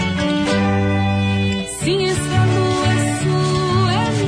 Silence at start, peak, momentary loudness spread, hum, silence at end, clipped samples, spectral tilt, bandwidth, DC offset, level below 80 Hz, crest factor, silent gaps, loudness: 0 s; -6 dBFS; 2 LU; none; 0 s; under 0.1%; -5.5 dB/octave; 11 kHz; under 0.1%; -40 dBFS; 12 dB; none; -17 LUFS